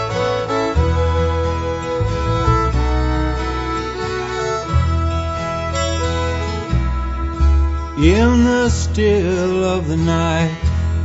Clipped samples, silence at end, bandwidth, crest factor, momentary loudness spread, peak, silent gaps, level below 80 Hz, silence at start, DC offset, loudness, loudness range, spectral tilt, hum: under 0.1%; 0 s; 8 kHz; 16 dB; 7 LU; 0 dBFS; none; -22 dBFS; 0 s; under 0.1%; -18 LUFS; 4 LU; -6.5 dB/octave; none